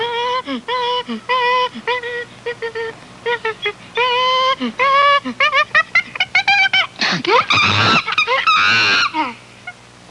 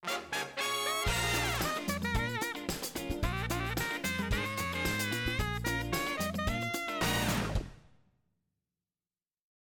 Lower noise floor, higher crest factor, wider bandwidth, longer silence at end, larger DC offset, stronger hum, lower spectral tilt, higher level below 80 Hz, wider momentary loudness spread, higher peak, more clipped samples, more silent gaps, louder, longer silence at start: second, -37 dBFS vs under -90 dBFS; about the same, 14 dB vs 14 dB; second, 11.5 kHz vs 18 kHz; second, 0.4 s vs 1.9 s; neither; neither; about the same, -3 dB/octave vs -3.5 dB/octave; second, -60 dBFS vs -44 dBFS; first, 14 LU vs 6 LU; first, -2 dBFS vs -20 dBFS; neither; neither; first, -15 LUFS vs -33 LUFS; about the same, 0 s vs 0 s